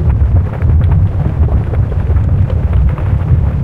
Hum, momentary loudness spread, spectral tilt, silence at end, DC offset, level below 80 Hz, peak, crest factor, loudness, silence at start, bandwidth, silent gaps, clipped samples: none; 3 LU; -10.5 dB/octave; 0 s; under 0.1%; -14 dBFS; 0 dBFS; 10 dB; -13 LUFS; 0 s; 3.7 kHz; none; under 0.1%